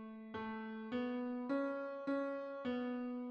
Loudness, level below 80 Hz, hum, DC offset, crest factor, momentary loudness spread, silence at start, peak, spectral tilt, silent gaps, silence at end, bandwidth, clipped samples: -42 LUFS; -78 dBFS; none; under 0.1%; 14 dB; 6 LU; 0 s; -28 dBFS; -7.5 dB/octave; none; 0 s; 6.2 kHz; under 0.1%